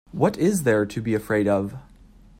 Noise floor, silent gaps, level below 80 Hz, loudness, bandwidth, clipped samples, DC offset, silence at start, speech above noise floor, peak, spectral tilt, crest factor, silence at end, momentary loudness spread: -50 dBFS; none; -52 dBFS; -22 LUFS; 16 kHz; under 0.1%; under 0.1%; 0.15 s; 28 dB; -6 dBFS; -6.5 dB/octave; 18 dB; 0.6 s; 8 LU